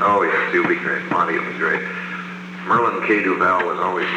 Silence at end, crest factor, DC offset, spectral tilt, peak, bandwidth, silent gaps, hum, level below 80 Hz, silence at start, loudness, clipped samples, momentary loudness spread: 0 s; 14 dB; under 0.1%; -6 dB/octave; -6 dBFS; 9.6 kHz; none; none; -66 dBFS; 0 s; -19 LUFS; under 0.1%; 11 LU